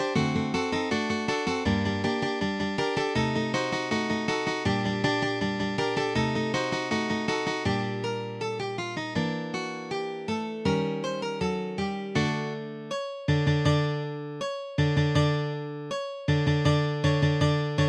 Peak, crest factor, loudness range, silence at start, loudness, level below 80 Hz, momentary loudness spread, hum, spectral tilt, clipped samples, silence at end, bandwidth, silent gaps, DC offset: -10 dBFS; 16 dB; 3 LU; 0 s; -28 LUFS; -50 dBFS; 9 LU; none; -6 dB/octave; under 0.1%; 0 s; 10 kHz; none; under 0.1%